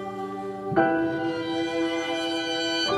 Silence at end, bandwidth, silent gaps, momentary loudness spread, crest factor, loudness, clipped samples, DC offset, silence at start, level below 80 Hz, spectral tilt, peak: 0 s; 12 kHz; none; 10 LU; 20 dB; -26 LUFS; under 0.1%; under 0.1%; 0 s; -60 dBFS; -4 dB/octave; -6 dBFS